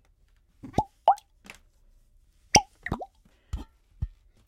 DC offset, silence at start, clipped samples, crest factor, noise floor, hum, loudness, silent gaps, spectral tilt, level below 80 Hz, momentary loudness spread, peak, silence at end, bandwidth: under 0.1%; 0.65 s; under 0.1%; 26 dB; -63 dBFS; none; -27 LUFS; none; -2.5 dB/octave; -46 dBFS; 27 LU; -6 dBFS; 0.4 s; 16 kHz